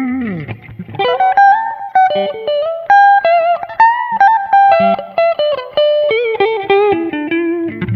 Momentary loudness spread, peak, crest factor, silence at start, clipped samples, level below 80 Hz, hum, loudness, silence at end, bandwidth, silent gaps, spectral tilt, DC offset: 10 LU; 0 dBFS; 12 dB; 0 s; under 0.1%; -52 dBFS; none; -12 LUFS; 0 s; 6 kHz; none; -7 dB/octave; under 0.1%